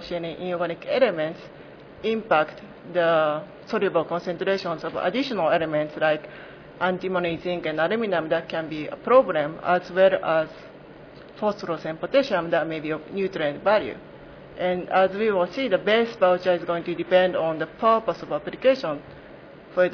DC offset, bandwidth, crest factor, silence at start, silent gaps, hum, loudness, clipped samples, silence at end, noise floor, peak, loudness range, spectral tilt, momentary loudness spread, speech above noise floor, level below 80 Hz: under 0.1%; 5.4 kHz; 18 dB; 0 s; none; none; -24 LUFS; under 0.1%; 0 s; -45 dBFS; -6 dBFS; 3 LU; -6.5 dB/octave; 12 LU; 21 dB; -60 dBFS